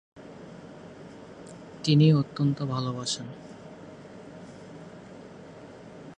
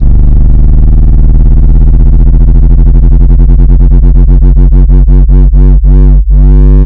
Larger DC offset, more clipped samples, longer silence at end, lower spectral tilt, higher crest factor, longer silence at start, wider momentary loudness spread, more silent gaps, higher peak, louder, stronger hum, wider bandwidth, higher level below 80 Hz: neither; second, under 0.1% vs 30%; about the same, 0.05 s vs 0 s; second, -6.5 dB/octave vs -12.5 dB/octave; first, 22 dB vs 2 dB; first, 0.15 s vs 0 s; first, 24 LU vs 1 LU; neither; second, -8 dBFS vs 0 dBFS; second, -25 LUFS vs -6 LUFS; neither; first, 9.6 kHz vs 1.6 kHz; second, -66 dBFS vs -2 dBFS